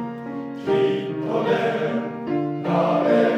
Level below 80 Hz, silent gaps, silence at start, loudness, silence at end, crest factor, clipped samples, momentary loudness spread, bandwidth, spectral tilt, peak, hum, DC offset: -66 dBFS; none; 0 s; -23 LUFS; 0 s; 14 dB; under 0.1%; 10 LU; 9 kHz; -7.5 dB/octave; -6 dBFS; none; under 0.1%